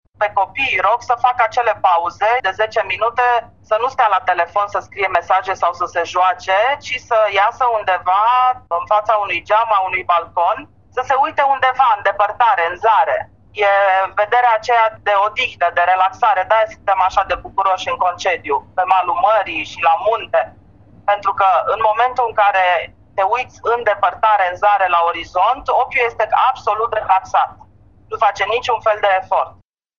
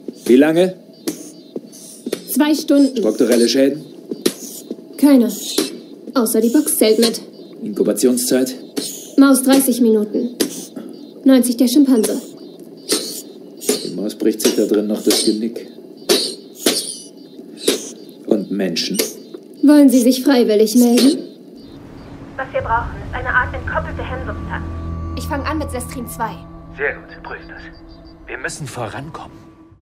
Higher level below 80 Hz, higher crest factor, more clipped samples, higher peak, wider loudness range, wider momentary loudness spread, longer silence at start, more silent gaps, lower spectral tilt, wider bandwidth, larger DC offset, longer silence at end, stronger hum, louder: second, -52 dBFS vs -42 dBFS; about the same, 16 dB vs 18 dB; neither; about the same, 0 dBFS vs 0 dBFS; second, 2 LU vs 10 LU; second, 6 LU vs 21 LU; about the same, 0.2 s vs 0.1 s; neither; about the same, -3 dB/octave vs -4 dB/octave; second, 7.4 kHz vs 16 kHz; first, 0.2% vs under 0.1%; about the same, 0.5 s vs 0.45 s; neither; about the same, -16 LUFS vs -16 LUFS